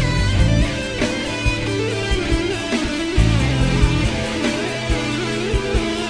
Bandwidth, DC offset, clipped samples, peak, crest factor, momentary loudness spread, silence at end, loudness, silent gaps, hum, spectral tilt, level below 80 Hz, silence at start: 10.5 kHz; under 0.1%; under 0.1%; -2 dBFS; 16 dB; 4 LU; 0 s; -20 LUFS; none; none; -5.5 dB/octave; -24 dBFS; 0 s